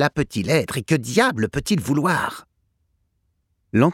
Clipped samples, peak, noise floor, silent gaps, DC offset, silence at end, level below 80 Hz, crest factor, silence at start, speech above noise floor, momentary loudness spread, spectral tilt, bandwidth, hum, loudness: under 0.1%; -4 dBFS; -70 dBFS; none; under 0.1%; 0 s; -48 dBFS; 18 dB; 0 s; 49 dB; 6 LU; -5.5 dB/octave; 16.5 kHz; none; -21 LUFS